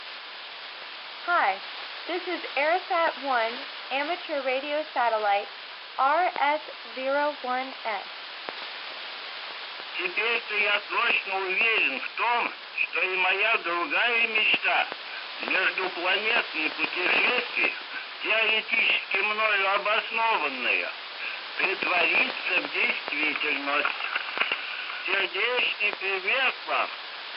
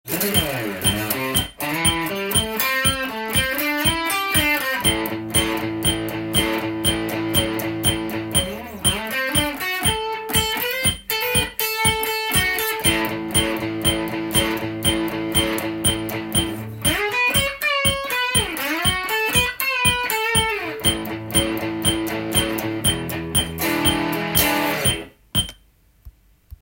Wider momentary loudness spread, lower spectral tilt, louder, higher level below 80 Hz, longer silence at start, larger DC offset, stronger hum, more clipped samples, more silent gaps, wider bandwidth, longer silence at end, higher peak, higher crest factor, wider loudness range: first, 13 LU vs 5 LU; second, 2.5 dB/octave vs -2.5 dB/octave; second, -25 LUFS vs -20 LUFS; second, under -90 dBFS vs -40 dBFS; about the same, 0 s vs 0.05 s; neither; neither; neither; neither; second, 5.8 kHz vs 17 kHz; about the same, 0 s vs 0.1 s; second, -8 dBFS vs -2 dBFS; about the same, 20 dB vs 20 dB; first, 5 LU vs 2 LU